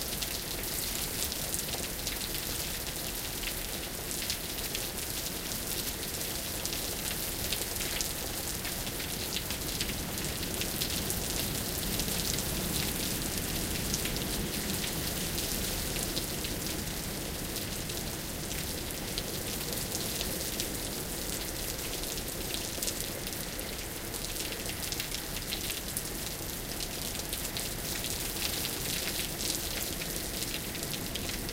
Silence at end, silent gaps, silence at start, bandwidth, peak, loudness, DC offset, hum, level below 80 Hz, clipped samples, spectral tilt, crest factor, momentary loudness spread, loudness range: 0 s; none; 0 s; 16.5 kHz; -8 dBFS; -33 LUFS; under 0.1%; none; -44 dBFS; under 0.1%; -2.5 dB/octave; 26 dB; 4 LU; 3 LU